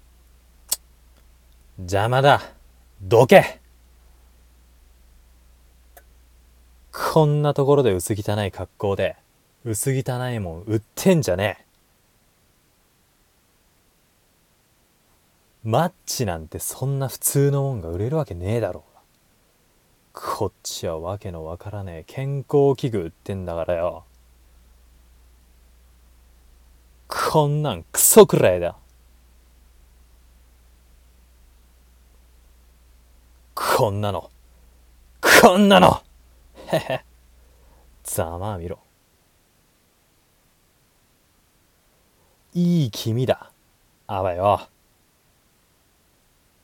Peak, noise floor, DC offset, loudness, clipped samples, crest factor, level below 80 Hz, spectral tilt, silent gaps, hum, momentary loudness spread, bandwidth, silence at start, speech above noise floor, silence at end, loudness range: 0 dBFS; -61 dBFS; under 0.1%; -20 LUFS; under 0.1%; 24 dB; -50 dBFS; -4.5 dB/octave; none; none; 19 LU; 17.5 kHz; 0.7 s; 41 dB; 2 s; 14 LU